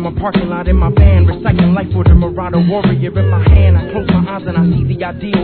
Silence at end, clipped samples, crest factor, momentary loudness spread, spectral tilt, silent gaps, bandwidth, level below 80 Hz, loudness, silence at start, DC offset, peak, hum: 0 s; 0.3%; 10 dB; 7 LU; -12 dB/octave; none; 4.5 kHz; -16 dBFS; -12 LUFS; 0 s; 0.3%; 0 dBFS; none